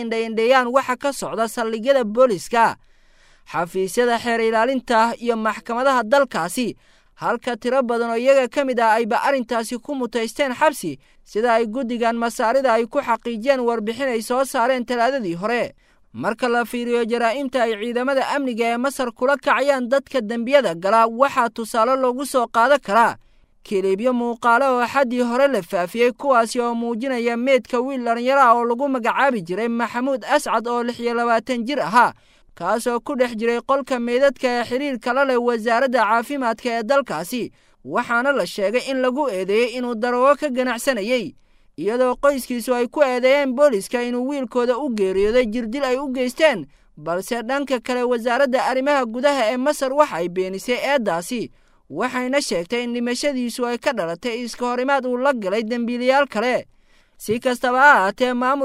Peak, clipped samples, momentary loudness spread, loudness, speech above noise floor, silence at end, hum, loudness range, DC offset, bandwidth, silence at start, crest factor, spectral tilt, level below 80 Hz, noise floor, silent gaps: -2 dBFS; under 0.1%; 7 LU; -20 LUFS; 33 dB; 0 s; none; 3 LU; under 0.1%; 16 kHz; 0 s; 18 dB; -4 dB/octave; -54 dBFS; -52 dBFS; none